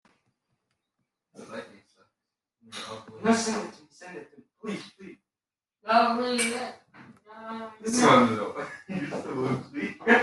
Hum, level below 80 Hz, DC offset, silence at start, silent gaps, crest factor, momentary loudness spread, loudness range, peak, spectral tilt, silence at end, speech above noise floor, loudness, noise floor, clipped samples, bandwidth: none; -70 dBFS; under 0.1%; 1.4 s; none; 22 dB; 22 LU; 8 LU; -6 dBFS; -4 dB/octave; 0 s; over 65 dB; -26 LUFS; under -90 dBFS; under 0.1%; 12.5 kHz